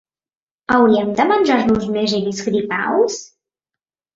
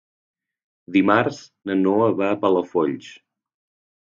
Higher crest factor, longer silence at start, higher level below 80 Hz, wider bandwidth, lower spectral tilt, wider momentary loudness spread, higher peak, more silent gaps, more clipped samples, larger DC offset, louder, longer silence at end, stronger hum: second, 16 dB vs 22 dB; second, 0.7 s vs 0.9 s; first, -50 dBFS vs -64 dBFS; about the same, 7.8 kHz vs 7.4 kHz; second, -5 dB/octave vs -7 dB/octave; about the same, 7 LU vs 9 LU; about the same, -2 dBFS vs -2 dBFS; neither; neither; neither; first, -17 LUFS vs -20 LUFS; about the same, 0.9 s vs 0.9 s; neither